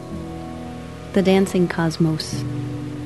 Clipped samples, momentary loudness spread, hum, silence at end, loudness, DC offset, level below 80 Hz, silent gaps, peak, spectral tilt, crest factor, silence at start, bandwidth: under 0.1%; 15 LU; none; 0 s; -21 LUFS; 0.4%; -46 dBFS; none; -4 dBFS; -6.5 dB/octave; 18 dB; 0 s; 12.5 kHz